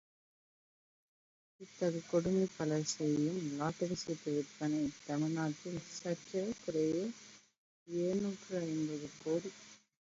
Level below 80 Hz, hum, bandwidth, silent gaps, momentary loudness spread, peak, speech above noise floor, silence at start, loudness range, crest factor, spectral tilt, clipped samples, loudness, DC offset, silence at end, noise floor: -72 dBFS; none; 7.6 kHz; 7.57-7.86 s; 9 LU; -20 dBFS; over 53 dB; 1.6 s; 3 LU; 18 dB; -6.5 dB/octave; under 0.1%; -38 LUFS; under 0.1%; 0.3 s; under -90 dBFS